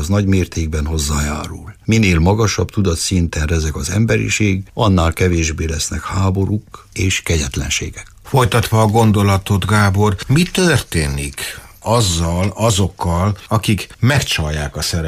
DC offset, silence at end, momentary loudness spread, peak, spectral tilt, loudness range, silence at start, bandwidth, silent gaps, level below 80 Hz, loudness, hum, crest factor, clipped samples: under 0.1%; 0 s; 7 LU; -2 dBFS; -5 dB/octave; 3 LU; 0 s; 15.5 kHz; none; -28 dBFS; -16 LUFS; none; 14 dB; under 0.1%